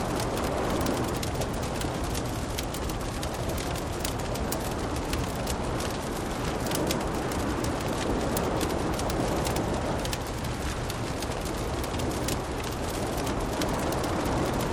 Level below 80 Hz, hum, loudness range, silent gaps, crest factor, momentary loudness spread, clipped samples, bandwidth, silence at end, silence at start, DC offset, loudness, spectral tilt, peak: -38 dBFS; none; 2 LU; none; 18 dB; 4 LU; under 0.1%; 19 kHz; 0 s; 0 s; under 0.1%; -30 LUFS; -5 dB/octave; -10 dBFS